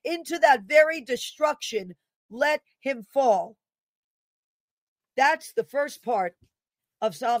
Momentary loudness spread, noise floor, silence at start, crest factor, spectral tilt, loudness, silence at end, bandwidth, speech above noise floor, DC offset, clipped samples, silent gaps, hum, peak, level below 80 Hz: 13 LU; -89 dBFS; 0.05 s; 22 dB; -2.5 dB/octave; -25 LUFS; 0 s; 16 kHz; 64 dB; under 0.1%; under 0.1%; 2.16-2.29 s, 3.80-4.96 s; none; -4 dBFS; -78 dBFS